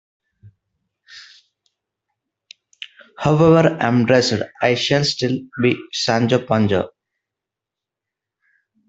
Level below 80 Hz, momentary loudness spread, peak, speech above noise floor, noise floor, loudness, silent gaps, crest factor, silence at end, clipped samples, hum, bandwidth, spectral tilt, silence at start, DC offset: -56 dBFS; 15 LU; -2 dBFS; 69 dB; -86 dBFS; -17 LUFS; none; 18 dB; 2 s; under 0.1%; none; 8 kHz; -5.5 dB/octave; 0.45 s; under 0.1%